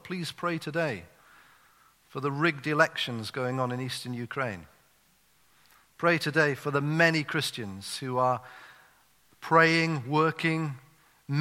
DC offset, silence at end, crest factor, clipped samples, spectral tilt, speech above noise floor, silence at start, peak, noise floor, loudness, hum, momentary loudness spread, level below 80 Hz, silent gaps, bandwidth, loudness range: under 0.1%; 0 s; 24 dB; under 0.1%; -5 dB/octave; 37 dB; 0.05 s; -6 dBFS; -65 dBFS; -28 LUFS; none; 12 LU; -72 dBFS; none; 16 kHz; 4 LU